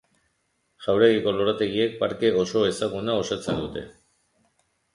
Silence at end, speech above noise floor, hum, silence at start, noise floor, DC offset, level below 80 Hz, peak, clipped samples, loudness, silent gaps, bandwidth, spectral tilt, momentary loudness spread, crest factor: 1.05 s; 49 dB; none; 0.8 s; -72 dBFS; under 0.1%; -56 dBFS; -4 dBFS; under 0.1%; -24 LUFS; none; 11.5 kHz; -5 dB/octave; 13 LU; 20 dB